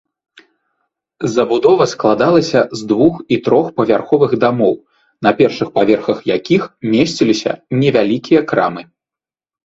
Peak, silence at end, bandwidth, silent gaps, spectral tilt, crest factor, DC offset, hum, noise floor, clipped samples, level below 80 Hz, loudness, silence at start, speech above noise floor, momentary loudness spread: 0 dBFS; 0.8 s; 7.8 kHz; none; -6 dB/octave; 14 dB; under 0.1%; none; -89 dBFS; under 0.1%; -54 dBFS; -14 LUFS; 1.2 s; 76 dB; 6 LU